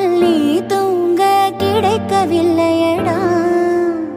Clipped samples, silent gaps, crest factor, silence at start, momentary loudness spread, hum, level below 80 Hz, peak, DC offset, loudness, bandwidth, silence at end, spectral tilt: under 0.1%; none; 12 dB; 0 s; 3 LU; none; -52 dBFS; 0 dBFS; under 0.1%; -14 LUFS; 16 kHz; 0 s; -6 dB/octave